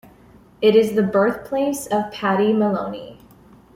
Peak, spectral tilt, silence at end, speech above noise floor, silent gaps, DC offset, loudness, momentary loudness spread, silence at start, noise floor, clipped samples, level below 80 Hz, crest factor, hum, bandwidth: -4 dBFS; -6 dB/octave; 0.6 s; 30 dB; none; under 0.1%; -19 LUFS; 9 LU; 0.6 s; -49 dBFS; under 0.1%; -56 dBFS; 16 dB; none; 16.5 kHz